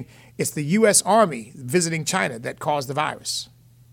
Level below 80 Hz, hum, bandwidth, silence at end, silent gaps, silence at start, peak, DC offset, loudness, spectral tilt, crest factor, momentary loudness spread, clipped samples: -62 dBFS; none; 18 kHz; 0.5 s; none; 0 s; -4 dBFS; under 0.1%; -21 LUFS; -3.5 dB/octave; 18 dB; 13 LU; under 0.1%